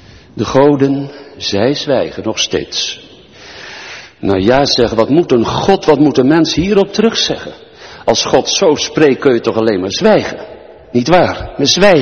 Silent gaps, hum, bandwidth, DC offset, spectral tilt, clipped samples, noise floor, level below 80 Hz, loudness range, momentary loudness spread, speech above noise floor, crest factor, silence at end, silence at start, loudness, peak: none; none; 8.8 kHz; under 0.1%; -4.5 dB/octave; 0.1%; -36 dBFS; -40 dBFS; 5 LU; 18 LU; 25 dB; 12 dB; 0 s; 0.35 s; -12 LUFS; 0 dBFS